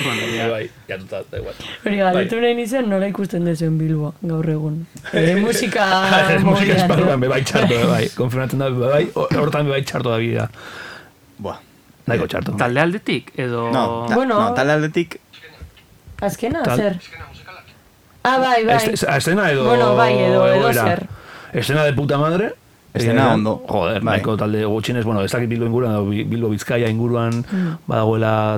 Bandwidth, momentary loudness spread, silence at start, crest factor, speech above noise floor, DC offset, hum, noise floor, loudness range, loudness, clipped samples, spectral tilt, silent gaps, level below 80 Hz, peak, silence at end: 17.5 kHz; 14 LU; 0 s; 18 dB; 32 dB; under 0.1%; none; -50 dBFS; 7 LU; -18 LUFS; under 0.1%; -6 dB/octave; none; -50 dBFS; 0 dBFS; 0 s